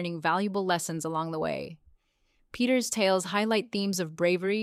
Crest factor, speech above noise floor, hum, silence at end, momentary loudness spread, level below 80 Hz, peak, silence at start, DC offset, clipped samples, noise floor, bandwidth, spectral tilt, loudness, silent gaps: 18 dB; 42 dB; none; 0 s; 7 LU; -66 dBFS; -12 dBFS; 0 s; under 0.1%; under 0.1%; -70 dBFS; 16 kHz; -4 dB/octave; -28 LUFS; none